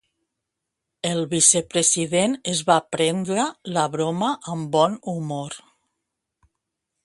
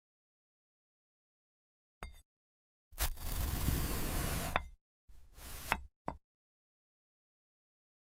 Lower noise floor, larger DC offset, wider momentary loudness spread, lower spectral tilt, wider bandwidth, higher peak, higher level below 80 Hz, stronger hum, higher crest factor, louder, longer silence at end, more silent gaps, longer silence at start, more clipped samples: second, -82 dBFS vs under -90 dBFS; neither; second, 13 LU vs 18 LU; about the same, -3 dB/octave vs -4 dB/octave; second, 11.5 kHz vs 16.5 kHz; first, -2 dBFS vs -10 dBFS; second, -64 dBFS vs -46 dBFS; neither; second, 22 dB vs 32 dB; first, -21 LUFS vs -39 LUFS; second, 1.45 s vs 1.85 s; second, none vs 2.25-2.91 s, 4.81-5.08 s, 5.96-6.05 s; second, 1.05 s vs 2 s; neither